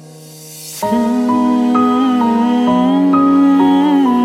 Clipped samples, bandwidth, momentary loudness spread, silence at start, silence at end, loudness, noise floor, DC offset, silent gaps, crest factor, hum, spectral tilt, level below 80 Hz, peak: under 0.1%; 15.5 kHz; 9 LU; 0 s; 0 s; -12 LUFS; -35 dBFS; under 0.1%; none; 10 dB; none; -6 dB/octave; -52 dBFS; -2 dBFS